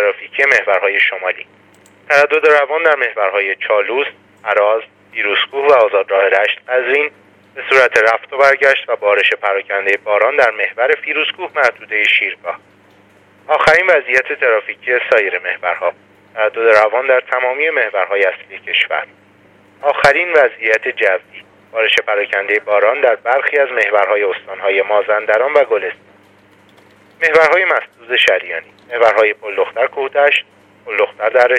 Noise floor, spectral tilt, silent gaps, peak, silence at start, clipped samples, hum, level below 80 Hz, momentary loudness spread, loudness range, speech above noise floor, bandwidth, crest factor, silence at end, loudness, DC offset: -48 dBFS; -2.5 dB/octave; none; 0 dBFS; 0 s; under 0.1%; none; -58 dBFS; 9 LU; 2 LU; 34 dB; 11.5 kHz; 14 dB; 0 s; -13 LUFS; under 0.1%